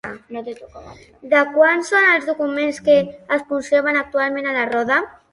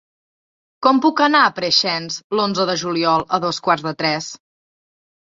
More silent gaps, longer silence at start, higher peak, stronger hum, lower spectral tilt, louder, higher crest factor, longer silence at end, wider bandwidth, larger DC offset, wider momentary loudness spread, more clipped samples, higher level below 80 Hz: second, none vs 2.24-2.30 s; second, 0.05 s vs 0.8 s; about the same, -2 dBFS vs 0 dBFS; neither; about the same, -4 dB/octave vs -3.5 dB/octave; about the same, -17 LUFS vs -17 LUFS; about the same, 16 dB vs 18 dB; second, 0.2 s vs 1.05 s; first, 11.5 kHz vs 7.8 kHz; neither; first, 17 LU vs 7 LU; neither; about the same, -58 dBFS vs -62 dBFS